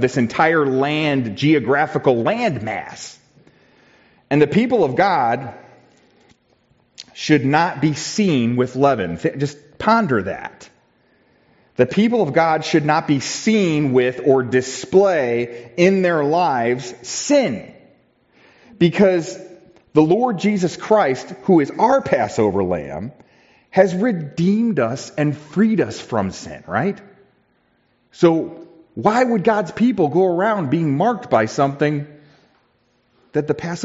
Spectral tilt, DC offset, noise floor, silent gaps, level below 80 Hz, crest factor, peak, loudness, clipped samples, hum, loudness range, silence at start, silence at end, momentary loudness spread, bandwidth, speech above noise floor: -5.5 dB/octave; under 0.1%; -62 dBFS; none; -58 dBFS; 18 dB; -2 dBFS; -18 LUFS; under 0.1%; none; 4 LU; 0 s; 0 s; 11 LU; 8 kHz; 45 dB